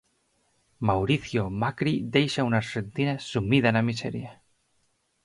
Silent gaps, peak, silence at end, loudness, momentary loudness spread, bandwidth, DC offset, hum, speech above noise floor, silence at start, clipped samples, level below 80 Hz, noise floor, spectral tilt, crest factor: none; -6 dBFS; 0.9 s; -26 LUFS; 10 LU; 11.5 kHz; under 0.1%; none; 45 dB; 0.8 s; under 0.1%; -52 dBFS; -71 dBFS; -6.5 dB/octave; 20 dB